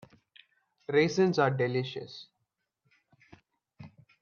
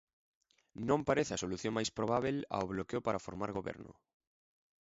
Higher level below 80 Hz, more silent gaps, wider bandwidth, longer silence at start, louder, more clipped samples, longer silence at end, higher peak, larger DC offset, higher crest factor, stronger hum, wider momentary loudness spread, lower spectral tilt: second, -74 dBFS vs -62 dBFS; neither; about the same, 7.2 kHz vs 7.6 kHz; about the same, 0.9 s vs 0.8 s; first, -28 LUFS vs -36 LUFS; neither; second, 0.35 s vs 0.9 s; first, -12 dBFS vs -16 dBFS; neither; about the same, 20 dB vs 22 dB; neither; first, 21 LU vs 12 LU; about the same, -6 dB/octave vs -5 dB/octave